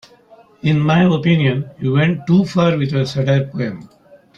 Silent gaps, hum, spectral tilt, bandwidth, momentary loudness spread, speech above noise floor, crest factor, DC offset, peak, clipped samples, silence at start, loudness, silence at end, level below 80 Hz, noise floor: none; none; -8 dB/octave; 7.6 kHz; 9 LU; 32 dB; 14 dB; under 0.1%; -2 dBFS; under 0.1%; 0.65 s; -16 LUFS; 0.5 s; -52 dBFS; -47 dBFS